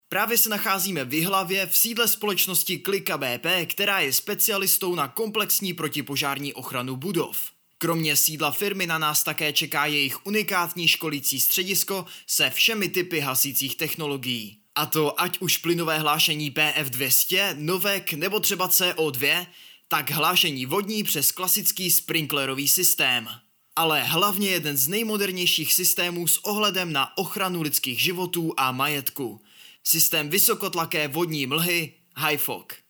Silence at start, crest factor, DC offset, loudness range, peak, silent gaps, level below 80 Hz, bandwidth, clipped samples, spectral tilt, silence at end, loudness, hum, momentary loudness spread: 0.1 s; 18 dB; under 0.1%; 3 LU; -6 dBFS; none; -76 dBFS; over 20 kHz; under 0.1%; -2 dB/octave; 0.15 s; -22 LUFS; none; 8 LU